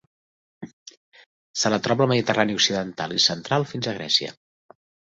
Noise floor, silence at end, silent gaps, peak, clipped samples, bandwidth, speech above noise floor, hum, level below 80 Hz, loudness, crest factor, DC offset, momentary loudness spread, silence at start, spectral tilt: under -90 dBFS; 0.8 s; 0.73-0.86 s, 0.97-1.12 s, 1.26-1.54 s; -4 dBFS; under 0.1%; 8 kHz; over 67 dB; none; -62 dBFS; -22 LUFS; 22 dB; under 0.1%; 19 LU; 0.6 s; -3.5 dB/octave